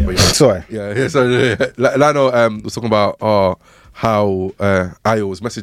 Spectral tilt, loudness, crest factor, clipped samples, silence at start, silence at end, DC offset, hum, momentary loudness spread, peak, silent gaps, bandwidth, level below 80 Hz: -4.5 dB/octave; -15 LUFS; 14 dB; under 0.1%; 0 s; 0 s; under 0.1%; none; 9 LU; 0 dBFS; none; 16.5 kHz; -34 dBFS